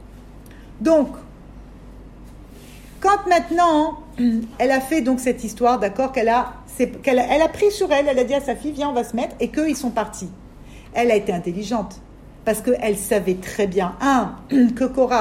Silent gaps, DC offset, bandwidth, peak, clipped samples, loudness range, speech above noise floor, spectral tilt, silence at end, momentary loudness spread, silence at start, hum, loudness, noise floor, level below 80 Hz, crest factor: none; under 0.1%; 16 kHz; -4 dBFS; under 0.1%; 4 LU; 21 dB; -5 dB/octave; 0 s; 8 LU; 0 s; none; -20 LUFS; -41 dBFS; -44 dBFS; 16 dB